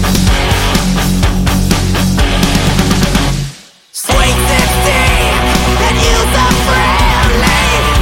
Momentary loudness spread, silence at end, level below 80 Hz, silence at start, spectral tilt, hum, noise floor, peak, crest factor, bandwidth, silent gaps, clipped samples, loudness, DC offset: 3 LU; 0 s; -16 dBFS; 0 s; -4 dB/octave; none; -31 dBFS; 0 dBFS; 10 dB; 17 kHz; none; under 0.1%; -11 LUFS; under 0.1%